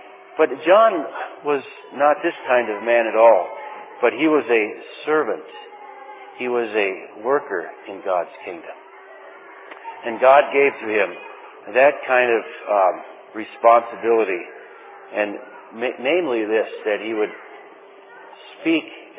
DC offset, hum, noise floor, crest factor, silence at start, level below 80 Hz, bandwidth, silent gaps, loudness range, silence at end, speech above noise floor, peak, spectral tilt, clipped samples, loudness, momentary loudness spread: under 0.1%; none; -44 dBFS; 20 dB; 0.05 s; -84 dBFS; 4 kHz; none; 7 LU; 0.15 s; 25 dB; 0 dBFS; -8 dB/octave; under 0.1%; -19 LUFS; 22 LU